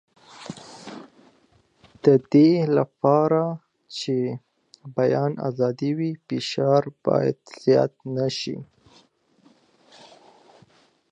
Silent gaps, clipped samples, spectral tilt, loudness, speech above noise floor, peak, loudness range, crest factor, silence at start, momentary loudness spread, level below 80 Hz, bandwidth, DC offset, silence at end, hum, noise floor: none; under 0.1%; -7 dB/octave; -22 LUFS; 40 dB; -4 dBFS; 6 LU; 20 dB; 0.4 s; 21 LU; -70 dBFS; 9.6 kHz; under 0.1%; 2.45 s; none; -61 dBFS